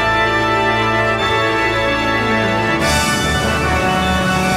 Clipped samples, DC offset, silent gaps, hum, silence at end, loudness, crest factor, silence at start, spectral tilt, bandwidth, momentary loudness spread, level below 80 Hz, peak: under 0.1%; under 0.1%; none; none; 0 s; -15 LUFS; 12 dB; 0 s; -4 dB/octave; 16.5 kHz; 1 LU; -30 dBFS; -4 dBFS